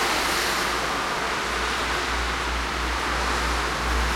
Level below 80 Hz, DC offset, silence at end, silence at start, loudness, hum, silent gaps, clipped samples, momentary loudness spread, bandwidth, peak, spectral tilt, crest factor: -32 dBFS; under 0.1%; 0 s; 0 s; -24 LUFS; none; none; under 0.1%; 3 LU; 16.5 kHz; -10 dBFS; -2.5 dB/octave; 14 dB